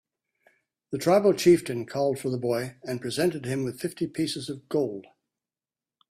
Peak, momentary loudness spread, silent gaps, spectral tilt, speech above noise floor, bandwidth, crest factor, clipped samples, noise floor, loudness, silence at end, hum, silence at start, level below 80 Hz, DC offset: -8 dBFS; 13 LU; none; -5.5 dB/octave; over 64 dB; 15 kHz; 20 dB; under 0.1%; under -90 dBFS; -26 LUFS; 1.1 s; none; 0.9 s; -66 dBFS; under 0.1%